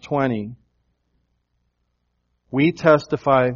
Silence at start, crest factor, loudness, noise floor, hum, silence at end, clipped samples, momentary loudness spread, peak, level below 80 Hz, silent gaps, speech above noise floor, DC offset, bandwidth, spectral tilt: 0.05 s; 22 dB; -19 LUFS; -71 dBFS; 60 Hz at -60 dBFS; 0 s; under 0.1%; 12 LU; 0 dBFS; -58 dBFS; none; 53 dB; under 0.1%; 7.2 kHz; -6 dB/octave